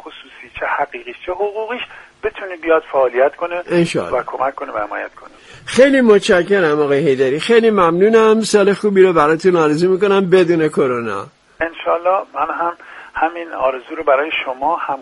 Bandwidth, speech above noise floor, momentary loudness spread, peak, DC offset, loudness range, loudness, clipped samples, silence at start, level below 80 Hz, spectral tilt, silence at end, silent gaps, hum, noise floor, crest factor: 11.5 kHz; 22 dB; 14 LU; 0 dBFS; under 0.1%; 7 LU; -15 LUFS; under 0.1%; 0.05 s; -52 dBFS; -5.5 dB/octave; 0 s; none; none; -37 dBFS; 16 dB